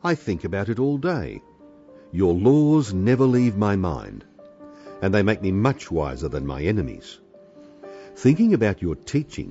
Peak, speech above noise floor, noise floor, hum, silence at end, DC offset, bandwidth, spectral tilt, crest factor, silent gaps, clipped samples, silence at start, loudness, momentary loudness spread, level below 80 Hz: -6 dBFS; 27 dB; -48 dBFS; none; 0 s; under 0.1%; 8 kHz; -7.5 dB/octave; 16 dB; none; under 0.1%; 0.05 s; -22 LUFS; 22 LU; -44 dBFS